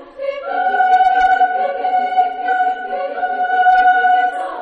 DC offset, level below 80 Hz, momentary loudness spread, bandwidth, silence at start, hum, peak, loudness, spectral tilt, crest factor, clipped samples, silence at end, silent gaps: under 0.1%; -52 dBFS; 10 LU; 6 kHz; 0 s; none; -2 dBFS; -15 LUFS; -2.5 dB/octave; 12 dB; under 0.1%; 0 s; none